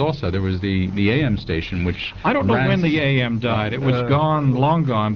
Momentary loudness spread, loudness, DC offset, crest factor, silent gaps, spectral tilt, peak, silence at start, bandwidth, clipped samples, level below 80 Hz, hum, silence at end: 6 LU; -19 LUFS; 0.3%; 12 dB; none; -5.5 dB/octave; -6 dBFS; 0 s; 6.4 kHz; under 0.1%; -40 dBFS; none; 0 s